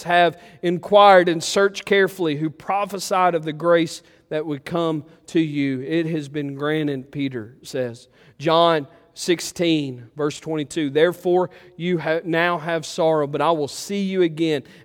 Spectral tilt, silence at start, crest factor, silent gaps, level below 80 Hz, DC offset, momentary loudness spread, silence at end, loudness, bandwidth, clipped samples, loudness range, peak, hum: -5 dB/octave; 0 s; 20 dB; none; -64 dBFS; under 0.1%; 11 LU; 0.25 s; -21 LUFS; 17 kHz; under 0.1%; 6 LU; 0 dBFS; none